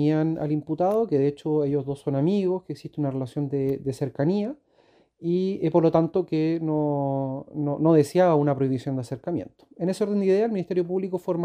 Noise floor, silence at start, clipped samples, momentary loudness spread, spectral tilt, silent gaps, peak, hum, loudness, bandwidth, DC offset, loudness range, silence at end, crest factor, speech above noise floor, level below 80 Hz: -61 dBFS; 0 s; under 0.1%; 10 LU; -8.5 dB/octave; none; -6 dBFS; none; -25 LUFS; 15 kHz; under 0.1%; 4 LU; 0 s; 18 dB; 37 dB; -64 dBFS